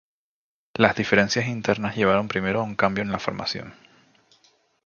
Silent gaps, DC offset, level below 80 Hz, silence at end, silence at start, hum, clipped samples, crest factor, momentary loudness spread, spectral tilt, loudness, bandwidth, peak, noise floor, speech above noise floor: none; under 0.1%; -54 dBFS; 1.15 s; 0.75 s; none; under 0.1%; 24 dB; 10 LU; -5 dB/octave; -23 LUFS; 7.2 kHz; 0 dBFS; -62 dBFS; 39 dB